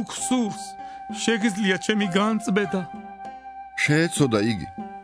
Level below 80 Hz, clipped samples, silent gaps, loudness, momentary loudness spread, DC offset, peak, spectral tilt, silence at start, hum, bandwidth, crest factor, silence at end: -58 dBFS; under 0.1%; none; -23 LUFS; 17 LU; under 0.1%; -6 dBFS; -4.5 dB/octave; 0 s; none; 11 kHz; 18 dB; 0 s